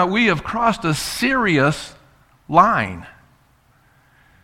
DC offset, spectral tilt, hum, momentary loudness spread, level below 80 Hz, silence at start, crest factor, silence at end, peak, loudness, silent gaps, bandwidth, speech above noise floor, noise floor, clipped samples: under 0.1%; -5 dB/octave; none; 13 LU; -46 dBFS; 0 s; 20 dB; 1.35 s; 0 dBFS; -18 LUFS; none; 16.5 kHz; 39 dB; -56 dBFS; under 0.1%